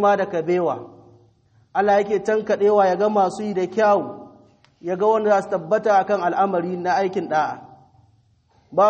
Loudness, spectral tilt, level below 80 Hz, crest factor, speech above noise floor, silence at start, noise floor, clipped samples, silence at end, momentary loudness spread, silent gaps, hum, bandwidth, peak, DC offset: -20 LUFS; -6 dB/octave; -66 dBFS; 16 dB; 40 dB; 0 s; -59 dBFS; under 0.1%; 0 s; 10 LU; none; none; 8.4 kHz; -6 dBFS; under 0.1%